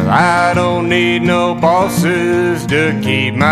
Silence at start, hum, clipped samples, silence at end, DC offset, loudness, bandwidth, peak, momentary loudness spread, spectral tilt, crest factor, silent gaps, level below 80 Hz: 0 s; none; under 0.1%; 0 s; under 0.1%; -13 LUFS; 15 kHz; 0 dBFS; 3 LU; -5.5 dB/octave; 12 dB; none; -44 dBFS